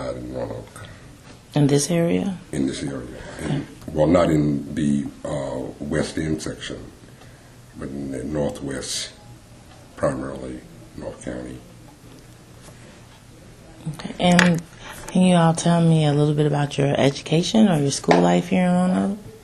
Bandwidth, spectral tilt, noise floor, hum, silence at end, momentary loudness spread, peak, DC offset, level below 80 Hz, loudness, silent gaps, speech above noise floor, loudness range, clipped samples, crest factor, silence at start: 12.5 kHz; -6 dB/octave; -45 dBFS; none; 0.05 s; 19 LU; 0 dBFS; under 0.1%; -46 dBFS; -21 LUFS; none; 24 dB; 14 LU; under 0.1%; 22 dB; 0 s